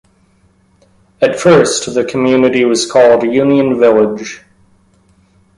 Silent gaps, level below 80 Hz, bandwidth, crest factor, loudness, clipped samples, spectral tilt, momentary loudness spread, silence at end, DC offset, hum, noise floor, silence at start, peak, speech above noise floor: none; -50 dBFS; 11.5 kHz; 12 dB; -11 LUFS; under 0.1%; -4.5 dB/octave; 7 LU; 1.2 s; under 0.1%; none; -52 dBFS; 1.2 s; 0 dBFS; 42 dB